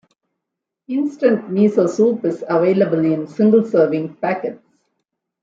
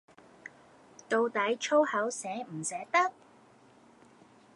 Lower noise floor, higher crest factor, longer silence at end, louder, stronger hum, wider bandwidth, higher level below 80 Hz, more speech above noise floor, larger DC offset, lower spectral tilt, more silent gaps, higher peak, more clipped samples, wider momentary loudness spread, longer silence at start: first, -81 dBFS vs -59 dBFS; second, 14 dB vs 20 dB; second, 0.85 s vs 1.45 s; first, -17 LUFS vs -30 LUFS; neither; second, 7.6 kHz vs 11.5 kHz; first, -68 dBFS vs -84 dBFS; first, 65 dB vs 30 dB; neither; first, -8 dB/octave vs -3 dB/octave; neither; first, -4 dBFS vs -12 dBFS; neither; second, 8 LU vs 23 LU; second, 0.9 s vs 1.1 s